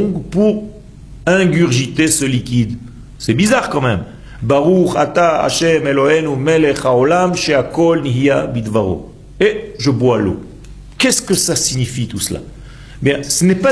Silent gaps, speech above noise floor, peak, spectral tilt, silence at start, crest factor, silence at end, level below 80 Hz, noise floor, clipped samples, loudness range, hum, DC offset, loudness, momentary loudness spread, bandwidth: none; 21 dB; 0 dBFS; -4.5 dB/octave; 0 s; 14 dB; 0 s; -38 dBFS; -35 dBFS; under 0.1%; 3 LU; none; under 0.1%; -14 LUFS; 9 LU; 11 kHz